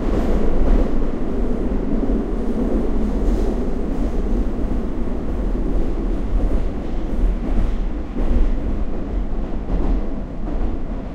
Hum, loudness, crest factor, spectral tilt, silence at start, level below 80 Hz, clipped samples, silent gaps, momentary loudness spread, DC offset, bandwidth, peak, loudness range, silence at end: none; -24 LUFS; 14 dB; -9 dB/octave; 0 s; -20 dBFS; under 0.1%; none; 6 LU; under 0.1%; 5.2 kHz; -4 dBFS; 3 LU; 0 s